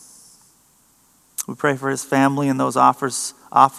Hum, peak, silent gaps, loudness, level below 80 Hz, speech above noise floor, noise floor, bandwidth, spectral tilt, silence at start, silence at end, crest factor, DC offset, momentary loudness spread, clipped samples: none; 0 dBFS; none; -19 LUFS; -72 dBFS; 39 dB; -57 dBFS; 15 kHz; -4.5 dB/octave; 1.4 s; 0 s; 20 dB; under 0.1%; 12 LU; under 0.1%